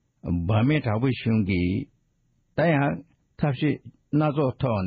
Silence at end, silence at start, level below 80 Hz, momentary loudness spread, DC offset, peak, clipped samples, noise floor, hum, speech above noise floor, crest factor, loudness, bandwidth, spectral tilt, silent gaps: 0 s; 0.25 s; -48 dBFS; 9 LU; under 0.1%; -10 dBFS; under 0.1%; -68 dBFS; none; 45 dB; 14 dB; -25 LUFS; 5 kHz; -7 dB/octave; none